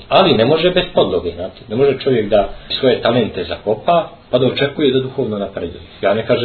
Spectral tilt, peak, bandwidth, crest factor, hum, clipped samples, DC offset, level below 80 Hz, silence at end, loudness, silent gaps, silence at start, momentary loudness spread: -9 dB/octave; 0 dBFS; 4.6 kHz; 16 dB; none; under 0.1%; under 0.1%; -40 dBFS; 0 s; -16 LUFS; none; 0 s; 10 LU